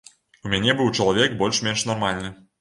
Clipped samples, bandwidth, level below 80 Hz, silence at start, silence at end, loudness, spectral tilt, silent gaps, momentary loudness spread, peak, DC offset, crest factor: under 0.1%; 11.5 kHz; -50 dBFS; 0.45 s; 0.25 s; -21 LUFS; -3.5 dB/octave; none; 11 LU; -4 dBFS; under 0.1%; 20 dB